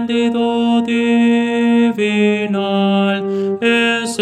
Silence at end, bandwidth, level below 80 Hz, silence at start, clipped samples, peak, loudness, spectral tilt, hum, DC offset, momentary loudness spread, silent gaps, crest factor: 0 s; 11 kHz; -64 dBFS; 0 s; under 0.1%; 0 dBFS; -15 LUFS; -5.5 dB/octave; none; under 0.1%; 4 LU; none; 14 dB